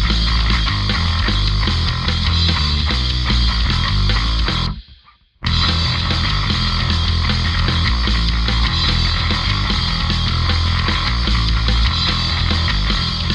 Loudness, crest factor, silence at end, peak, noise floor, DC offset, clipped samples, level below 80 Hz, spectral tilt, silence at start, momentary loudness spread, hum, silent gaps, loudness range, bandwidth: -17 LUFS; 14 dB; 0 s; -2 dBFS; -48 dBFS; under 0.1%; under 0.1%; -20 dBFS; -4.5 dB/octave; 0 s; 2 LU; none; none; 1 LU; 9 kHz